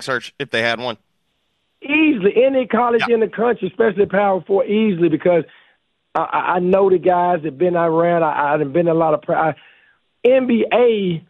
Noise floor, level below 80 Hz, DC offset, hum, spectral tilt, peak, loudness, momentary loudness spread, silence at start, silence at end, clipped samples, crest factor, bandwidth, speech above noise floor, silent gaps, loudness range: -68 dBFS; -60 dBFS; under 0.1%; none; -7 dB/octave; -2 dBFS; -17 LUFS; 8 LU; 0 s; 0.1 s; under 0.1%; 14 dB; 10 kHz; 52 dB; none; 2 LU